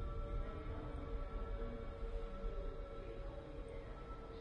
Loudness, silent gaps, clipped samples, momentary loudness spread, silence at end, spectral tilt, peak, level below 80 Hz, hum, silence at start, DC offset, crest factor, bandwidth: -49 LUFS; none; under 0.1%; 4 LU; 0 s; -8 dB/octave; -32 dBFS; -46 dBFS; none; 0 s; under 0.1%; 14 dB; 5.6 kHz